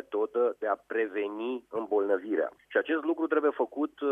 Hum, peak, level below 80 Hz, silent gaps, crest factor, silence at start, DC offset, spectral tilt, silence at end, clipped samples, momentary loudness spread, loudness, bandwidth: none; -12 dBFS; -78 dBFS; none; 18 dB; 0.1 s; under 0.1%; -6.5 dB/octave; 0 s; under 0.1%; 6 LU; -30 LUFS; 3.7 kHz